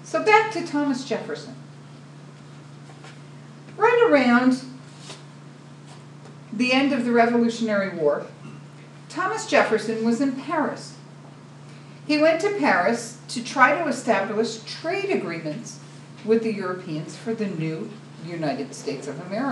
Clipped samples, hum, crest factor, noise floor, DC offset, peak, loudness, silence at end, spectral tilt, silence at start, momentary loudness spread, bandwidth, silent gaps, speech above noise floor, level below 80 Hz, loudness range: under 0.1%; none; 22 dB; -43 dBFS; under 0.1%; -2 dBFS; -22 LUFS; 0 s; -5 dB/octave; 0 s; 25 LU; 11.5 kHz; none; 21 dB; -78 dBFS; 6 LU